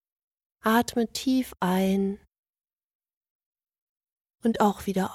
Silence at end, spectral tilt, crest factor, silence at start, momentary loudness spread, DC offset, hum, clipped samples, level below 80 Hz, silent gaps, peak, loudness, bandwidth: 0 s; -5.5 dB/octave; 18 dB; 0.65 s; 7 LU; under 0.1%; none; under 0.1%; -58 dBFS; 2.38-2.53 s, 2.84-3.00 s, 3.17-3.21 s, 3.30-3.40 s, 3.46-3.52 s, 3.82-3.96 s, 4.12-4.16 s; -10 dBFS; -26 LUFS; 16 kHz